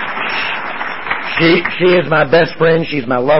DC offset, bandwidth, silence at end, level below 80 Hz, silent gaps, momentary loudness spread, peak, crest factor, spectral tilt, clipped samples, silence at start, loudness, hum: 3%; 5.8 kHz; 0 s; -48 dBFS; none; 8 LU; -2 dBFS; 12 dB; -10 dB/octave; under 0.1%; 0 s; -14 LUFS; none